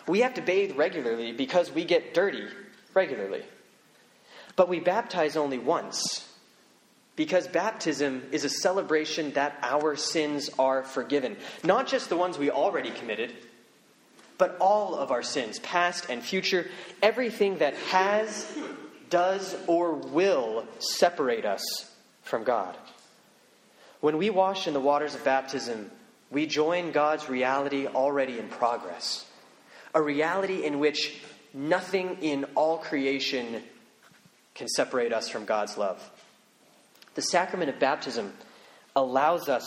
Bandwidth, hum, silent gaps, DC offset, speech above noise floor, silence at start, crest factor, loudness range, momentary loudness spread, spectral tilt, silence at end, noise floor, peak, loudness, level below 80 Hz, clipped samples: 16 kHz; none; none; under 0.1%; 34 dB; 0 s; 20 dB; 3 LU; 10 LU; -3.5 dB/octave; 0 s; -61 dBFS; -8 dBFS; -28 LUFS; -78 dBFS; under 0.1%